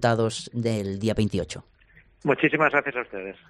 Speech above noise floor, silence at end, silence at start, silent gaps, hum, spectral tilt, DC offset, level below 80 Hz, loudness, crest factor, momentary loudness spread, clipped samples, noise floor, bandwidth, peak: 32 dB; 0.15 s; 0 s; none; none; -5.5 dB/octave; under 0.1%; -52 dBFS; -25 LUFS; 20 dB; 12 LU; under 0.1%; -56 dBFS; 12.5 kHz; -4 dBFS